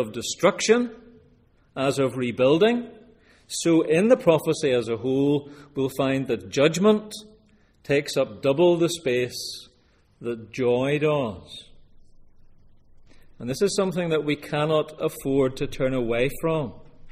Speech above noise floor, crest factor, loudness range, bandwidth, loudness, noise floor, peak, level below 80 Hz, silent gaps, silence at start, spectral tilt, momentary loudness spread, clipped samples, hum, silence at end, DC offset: 38 dB; 20 dB; 6 LU; 15.5 kHz; -23 LUFS; -60 dBFS; -4 dBFS; -50 dBFS; none; 0 s; -5 dB/octave; 14 LU; under 0.1%; none; 0 s; under 0.1%